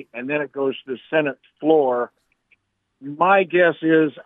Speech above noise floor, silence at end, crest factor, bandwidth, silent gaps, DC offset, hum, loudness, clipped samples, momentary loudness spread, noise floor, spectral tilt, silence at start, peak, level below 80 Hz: 44 dB; 0.05 s; 18 dB; 3.9 kHz; none; under 0.1%; none; -20 LUFS; under 0.1%; 14 LU; -64 dBFS; -8.5 dB/octave; 0.15 s; -2 dBFS; -80 dBFS